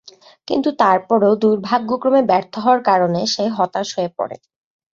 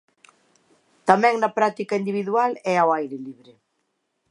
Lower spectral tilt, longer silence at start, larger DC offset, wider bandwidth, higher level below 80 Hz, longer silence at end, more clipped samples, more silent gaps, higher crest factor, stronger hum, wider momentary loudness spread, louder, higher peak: about the same, -5 dB/octave vs -5.5 dB/octave; second, 0.5 s vs 1.05 s; neither; second, 7.6 kHz vs 11 kHz; first, -64 dBFS vs -76 dBFS; second, 0.6 s vs 1 s; neither; neither; second, 16 dB vs 24 dB; neither; second, 8 LU vs 12 LU; first, -17 LUFS vs -21 LUFS; about the same, -2 dBFS vs 0 dBFS